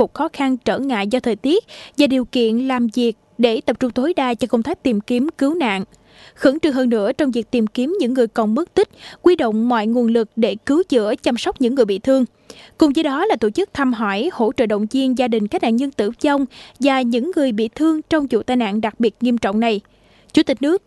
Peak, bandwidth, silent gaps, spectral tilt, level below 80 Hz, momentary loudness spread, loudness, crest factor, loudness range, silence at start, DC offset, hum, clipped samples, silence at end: 0 dBFS; 12 kHz; none; -5.5 dB/octave; -52 dBFS; 4 LU; -18 LUFS; 18 dB; 1 LU; 0 s; under 0.1%; none; under 0.1%; 0.1 s